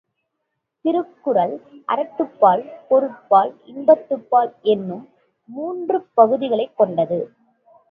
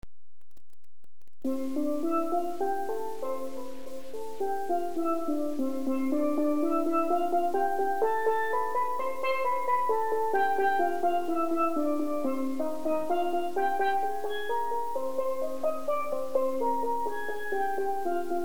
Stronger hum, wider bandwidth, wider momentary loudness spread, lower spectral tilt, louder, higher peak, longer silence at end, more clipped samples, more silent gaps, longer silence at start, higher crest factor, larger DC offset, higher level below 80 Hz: neither; second, 4.5 kHz vs over 20 kHz; first, 12 LU vs 7 LU; first, -9.5 dB/octave vs -5 dB/octave; first, -19 LUFS vs -30 LUFS; first, 0 dBFS vs -14 dBFS; first, 0.65 s vs 0 s; neither; neither; second, 0.85 s vs 1.45 s; first, 20 dB vs 14 dB; second, under 0.1% vs 2%; second, -72 dBFS vs -64 dBFS